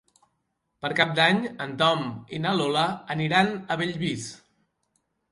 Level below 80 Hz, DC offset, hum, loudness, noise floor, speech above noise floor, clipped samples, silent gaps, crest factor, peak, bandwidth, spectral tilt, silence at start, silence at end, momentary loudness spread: -64 dBFS; under 0.1%; none; -25 LUFS; -77 dBFS; 52 dB; under 0.1%; none; 22 dB; -4 dBFS; 11.5 kHz; -5 dB/octave; 0.85 s; 0.95 s; 12 LU